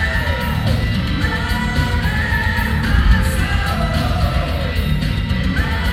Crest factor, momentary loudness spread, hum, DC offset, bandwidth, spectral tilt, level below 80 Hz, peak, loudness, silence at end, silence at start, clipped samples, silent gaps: 16 dB; 3 LU; none; under 0.1%; 16 kHz; -6 dB/octave; -20 dBFS; 0 dBFS; -18 LUFS; 0 s; 0 s; under 0.1%; none